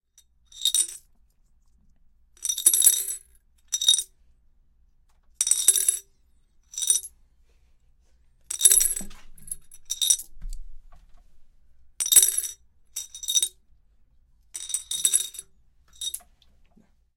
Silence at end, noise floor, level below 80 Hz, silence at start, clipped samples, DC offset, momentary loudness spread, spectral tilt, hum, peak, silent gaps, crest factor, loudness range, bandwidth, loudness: 1 s; -61 dBFS; -48 dBFS; 0.55 s; under 0.1%; under 0.1%; 22 LU; 3 dB/octave; none; 0 dBFS; none; 28 dB; 5 LU; 17 kHz; -21 LUFS